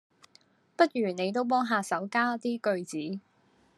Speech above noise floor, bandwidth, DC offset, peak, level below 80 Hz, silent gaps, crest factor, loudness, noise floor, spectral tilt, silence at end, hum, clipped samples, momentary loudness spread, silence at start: 37 dB; 12.5 kHz; under 0.1%; -8 dBFS; -84 dBFS; none; 22 dB; -29 LUFS; -66 dBFS; -5 dB/octave; 0.6 s; none; under 0.1%; 11 LU; 0.8 s